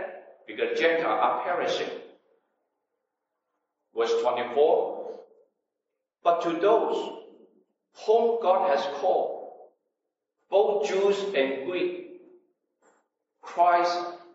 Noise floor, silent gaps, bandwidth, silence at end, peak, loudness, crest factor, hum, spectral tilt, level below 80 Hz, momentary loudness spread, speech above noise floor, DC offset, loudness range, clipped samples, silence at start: -85 dBFS; none; 8 kHz; 0.1 s; -10 dBFS; -25 LUFS; 18 dB; none; -4 dB/octave; under -90 dBFS; 17 LU; 60 dB; under 0.1%; 3 LU; under 0.1%; 0 s